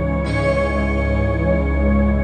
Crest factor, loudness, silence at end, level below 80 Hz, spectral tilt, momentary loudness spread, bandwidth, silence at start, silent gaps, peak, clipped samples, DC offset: 12 dB; -19 LUFS; 0 s; -22 dBFS; -8.5 dB/octave; 2 LU; 9 kHz; 0 s; none; -6 dBFS; under 0.1%; under 0.1%